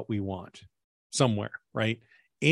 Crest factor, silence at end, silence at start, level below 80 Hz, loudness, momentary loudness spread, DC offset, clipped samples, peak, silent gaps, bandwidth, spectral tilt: 22 dB; 0 s; 0 s; -68 dBFS; -31 LUFS; 12 LU; under 0.1%; under 0.1%; -8 dBFS; 0.84-1.10 s; 12 kHz; -5 dB/octave